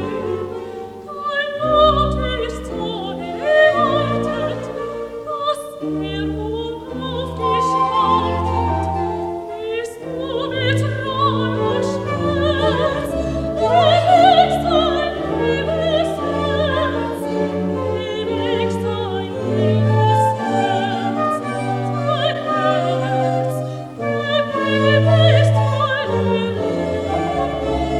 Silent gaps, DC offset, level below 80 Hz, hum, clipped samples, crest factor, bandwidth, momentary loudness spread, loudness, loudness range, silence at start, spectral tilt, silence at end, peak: none; under 0.1%; -38 dBFS; none; under 0.1%; 18 dB; 13 kHz; 12 LU; -18 LUFS; 5 LU; 0 s; -6.5 dB/octave; 0 s; 0 dBFS